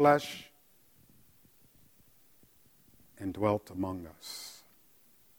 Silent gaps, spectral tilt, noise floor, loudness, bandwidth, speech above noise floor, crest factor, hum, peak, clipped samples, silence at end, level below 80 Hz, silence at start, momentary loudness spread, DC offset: none; -5.5 dB/octave; -65 dBFS; -34 LUFS; over 20 kHz; 34 dB; 26 dB; none; -10 dBFS; under 0.1%; 0.8 s; -68 dBFS; 0 s; 17 LU; under 0.1%